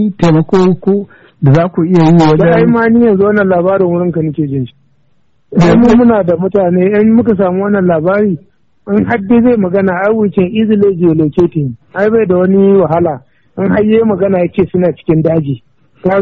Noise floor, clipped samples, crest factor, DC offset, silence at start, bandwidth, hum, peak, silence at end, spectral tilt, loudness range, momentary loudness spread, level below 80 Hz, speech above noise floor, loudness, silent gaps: -58 dBFS; under 0.1%; 10 dB; 0.3%; 0 s; 7.6 kHz; none; 0 dBFS; 0 s; -8 dB/octave; 2 LU; 9 LU; -38 dBFS; 49 dB; -10 LUFS; none